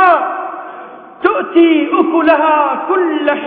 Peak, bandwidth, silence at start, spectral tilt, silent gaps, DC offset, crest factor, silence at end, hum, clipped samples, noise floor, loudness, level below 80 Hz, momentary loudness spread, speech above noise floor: 0 dBFS; 4.5 kHz; 0 s; -7.5 dB/octave; none; under 0.1%; 12 dB; 0 s; none; under 0.1%; -32 dBFS; -12 LUFS; -58 dBFS; 15 LU; 21 dB